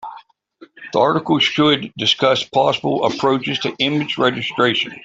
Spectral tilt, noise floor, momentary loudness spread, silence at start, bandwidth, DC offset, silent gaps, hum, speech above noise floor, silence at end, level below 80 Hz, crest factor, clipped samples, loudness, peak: -4.5 dB/octave; -47 dBFS; 5 LU; 0 s; 7.8 kHz; under 0.1%; none; none; 30 dB; 0.05 s; -58 dBFS; 16 dB; under 0.1%; -17 LUFS; -2 dBFS